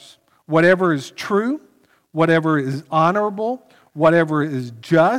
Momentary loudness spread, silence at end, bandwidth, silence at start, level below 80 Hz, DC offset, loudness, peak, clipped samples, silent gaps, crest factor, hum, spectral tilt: 12 LU; 0 s; 13.5 kHz; 0.5 s; -64 dBFS; under 0.1%; -18 LUFS; -4 dBFS; under 0.1%; none; 16 dB; none; -7 dB/octave